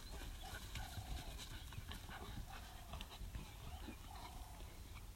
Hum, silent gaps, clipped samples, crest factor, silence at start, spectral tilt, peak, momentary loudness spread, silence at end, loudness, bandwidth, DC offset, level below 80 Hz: none; none; under 0.1%; 18 dB; 0 s; -4 dB/octave; -34 dBFS; 5 LU; 0 s; -53 LUFS; 16 kHz; under 0.1%; -54 dBFS